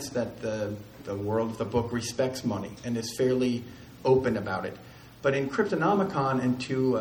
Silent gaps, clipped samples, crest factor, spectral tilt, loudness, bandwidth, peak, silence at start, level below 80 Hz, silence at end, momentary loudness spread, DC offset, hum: none; under 0.1%; 18 dB; -6 dB/octave; -28 LUFS; over 20 kHz; -10 dBFS; 0 s; -56 dBFS; 0 s; 10 LU; under 0.1%; none